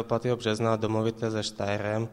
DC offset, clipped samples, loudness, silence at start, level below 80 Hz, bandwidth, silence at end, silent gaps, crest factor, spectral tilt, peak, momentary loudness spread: under 0.1%; under 0.1%; -28 LUFS; 0 s; -58 dBFS; 12 kHz; 0 s; none; 18 dB; -6 dB/octave; -10 dBFS; 4 LU